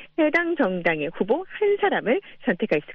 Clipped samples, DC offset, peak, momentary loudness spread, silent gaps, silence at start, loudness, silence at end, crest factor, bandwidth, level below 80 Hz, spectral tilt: under 0.1%; under 0.1%; -6 dBFS; 5 LU; none; 0 s; -23 LUFS; 0 s; 18 dB; 6.4 kHz; -60 dBFS; -7.5 dB/octave